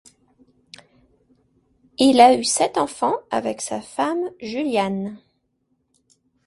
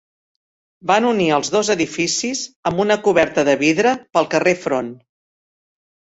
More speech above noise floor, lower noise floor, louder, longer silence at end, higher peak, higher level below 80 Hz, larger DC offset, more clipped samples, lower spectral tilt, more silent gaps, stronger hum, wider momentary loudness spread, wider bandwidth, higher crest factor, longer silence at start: second, 51 dB vs over 73 dB; second, -70 dBFS vs under -90 dBFS; second, -20 LUFS vs -17 LUFS; first, 1.3 s vs 1.1 s; about the same, 0 dBFS vs -2 dBFS; second, -62 dBFS vs -56 dBFS; neither; neither; about the same, -3.5 dB/octave vs -3.5 dB/octave; second, none vs 2.56-2.63 s; neither; first, 15 LU vs 8 LU; first, 11.5 kHz vs 8.4 kHz; about the same, 22 dB vs 18 dB; first, 2 s vs 0.85 s